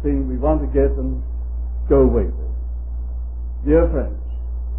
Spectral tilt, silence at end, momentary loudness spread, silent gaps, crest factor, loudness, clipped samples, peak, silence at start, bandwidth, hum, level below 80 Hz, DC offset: -14 dB/octave; 0 s; 13 LU; none; 16 dB; -21 LUFS; under 0.1%; -2 dBFS; 0 s; 2.8 kHz; none; -22 dBFS; 1%